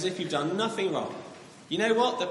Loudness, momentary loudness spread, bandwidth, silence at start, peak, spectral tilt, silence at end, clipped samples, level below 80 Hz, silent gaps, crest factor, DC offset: -28 LUFS; 18 LU; 11.5 kHz; 0 s; -12 dBFS; -4.5 dB/octave; 0 s; under 0.1%; -74 dBFS; none; 16 dB; under 0.1%